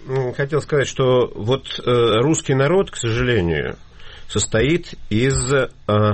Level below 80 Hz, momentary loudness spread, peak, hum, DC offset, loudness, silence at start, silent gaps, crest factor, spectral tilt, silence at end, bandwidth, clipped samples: -38 dBFS; 7 LU; -6 dBFS; none; under 0.1%; -19 LUFS; 0 s; none; 12 dB; -5 dB/octave; 0 s; 8.8 kHz; under 0.1%